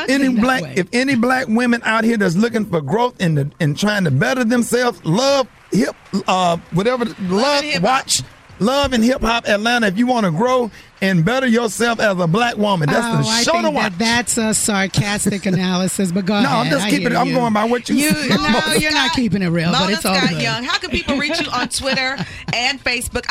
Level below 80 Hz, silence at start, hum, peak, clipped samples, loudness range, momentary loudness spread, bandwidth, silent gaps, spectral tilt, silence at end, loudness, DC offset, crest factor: -42 dBFS; 0 s; none; -2 dBFS; under 0.1%; 2 LU; 4 LU; 16 kHz; none; -4.5 dB/octave; 0.1 s; -17 LUFS; under 0.1%; 14 dB